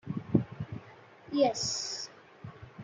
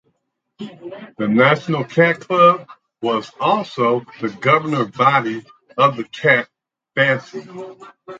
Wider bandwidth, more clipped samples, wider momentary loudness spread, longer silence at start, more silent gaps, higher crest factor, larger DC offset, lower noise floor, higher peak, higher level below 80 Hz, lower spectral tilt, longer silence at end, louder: first, 9.6 kHz vs 7.8 kHz; neither; about the same, 20 LU vs 21 LU; second, 0.05 s vs 0.6 s; neither; first, 24 dB vs 18 dB; neither; second, -54 dBFS vs -71 dBFS; second, -10 dBFS vs 0 dBFS; about the same, -64 dBFS vs -66 dBFS; second, -4.5 dB/octave vs -6.5 dB/octave; about the same, 0 s vs 0 s; second, -32 LUFS vs -17 LUFS